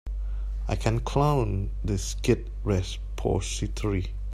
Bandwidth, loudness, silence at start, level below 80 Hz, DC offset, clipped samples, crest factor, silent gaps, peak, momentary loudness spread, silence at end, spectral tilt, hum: 13.5 kHz; -28 LUFS; 0.05 s; -32 dBFS; under 0.1%; under 0.1%; 18 dB; none; -8 dBFS; 10 LU; 0 s; -6 dB/octave; none